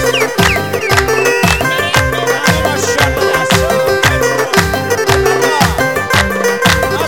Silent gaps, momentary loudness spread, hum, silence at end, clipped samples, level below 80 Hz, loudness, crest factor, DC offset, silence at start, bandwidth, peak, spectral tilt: none; 2 LU; none; 0 s; 0.1%; -28 dBFS; -11 LUFS; 12 dB; 0.9%; 0 s; 19.5 kHz; 0 dBFS; -3.5 dB/octave